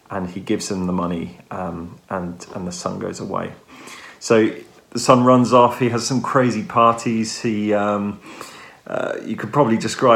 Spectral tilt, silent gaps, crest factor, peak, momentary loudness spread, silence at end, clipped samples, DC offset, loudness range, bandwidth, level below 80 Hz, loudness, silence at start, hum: -5.5 dB/octave; none; 20 dB; 0 dBFS; 20 LU; 0 s; under 0.1%; under 0.1%; 10 LU; 15 kHz; -58 dBFS; -19 LUFS; 0.1 s; none